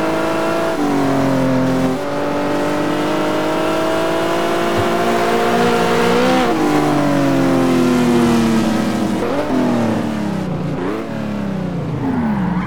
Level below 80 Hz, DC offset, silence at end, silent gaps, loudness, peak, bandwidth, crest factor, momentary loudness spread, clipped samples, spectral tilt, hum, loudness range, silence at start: -42 dBFS; 4%; 0 s; none; -16 LUFS; -4 dBFS; 19 kHz; 10 dB; 7 LU; under 0.1%; -6 dB/octave; none; 5 LU; 0 s